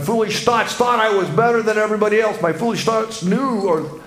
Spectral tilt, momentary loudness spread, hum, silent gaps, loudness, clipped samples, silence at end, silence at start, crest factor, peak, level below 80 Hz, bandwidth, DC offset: -5 dB/octave; 4 LU; none; none; -17 LUFS; under 0.1%; 0 s; 0 s; 16 dB; -2 dBFS; -56 dBFS; 16 kHz; under 0.1%